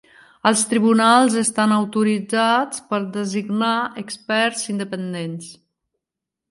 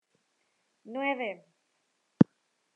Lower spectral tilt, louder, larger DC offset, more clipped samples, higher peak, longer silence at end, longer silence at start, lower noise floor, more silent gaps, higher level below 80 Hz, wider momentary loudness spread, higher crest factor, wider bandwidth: second, -4 dB/octave vs -9 dB/octave; first, -19 LUFS vs -29 LUFS; neither; neither; about the same, -2 dBFS vs -2 dBFS; first, 0.95 s vs 0.55 s; second, 0.45 s vs 0.85 s; first, -85 dBFS vs -76 dBFS; neither; first, -70 dBFS vs -76 dBFS; about the same, 13 LU vs 15 LU; second, 18 dB vs 30 dB; first, 11.5 kHz vs 6.6 kHz